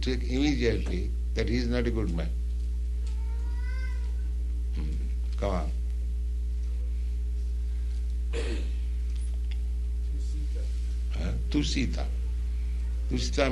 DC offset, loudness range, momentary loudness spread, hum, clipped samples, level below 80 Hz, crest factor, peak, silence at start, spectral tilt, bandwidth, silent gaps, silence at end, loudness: under 0.1%; 2 LU; 5 LU; none; under 0.1%; -30 dBFS; 20 dB; -8 dBFS; 0 s; -6.5 dB/octave; 10.5 kHz; none; 0 s; -31 LUFS